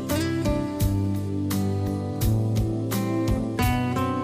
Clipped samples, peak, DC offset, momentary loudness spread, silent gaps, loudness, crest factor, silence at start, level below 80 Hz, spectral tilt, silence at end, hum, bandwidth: under 0.1%; -14 dBFS; under 0.1%; 3 LU; none; -25 LUFS; 12 dB; 0 s; -36 dBFS; -6.5 dB/octave; 0 s; none; 15.5 kHz